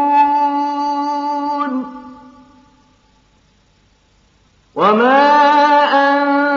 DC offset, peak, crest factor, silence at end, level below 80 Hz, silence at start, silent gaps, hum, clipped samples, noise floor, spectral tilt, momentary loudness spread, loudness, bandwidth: under 0.1%; -2 dBFS; 14 dB; 0 s; -60 dBFS; 0 s; none; none; under 0.1%; -55 dBFS; -1.5 dB/octave; 12 LU; -13 LUFS; 7.2 kHz